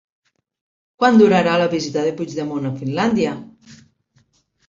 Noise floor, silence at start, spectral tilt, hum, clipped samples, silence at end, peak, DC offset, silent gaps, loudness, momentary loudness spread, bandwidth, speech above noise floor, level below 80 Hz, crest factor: -62 dBFS; 1 s; -6 dB/octave; none; under 0.1%; 0.95 s; -2 dBFS; under 0.1%; none; -18 LUFS; 12 LU; 7.6 kHz; 44 dB; -60 dBFS; 18 dB